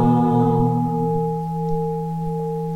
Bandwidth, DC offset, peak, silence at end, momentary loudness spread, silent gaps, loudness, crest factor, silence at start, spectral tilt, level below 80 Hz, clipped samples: 4.3 kHz; under 0.1%; -6 dBFS; 0 s; 8 LU; none; -21 LUFS; 14 dB; 0 s; -10.5 dB/octave; -42 dBFS; under 0.1%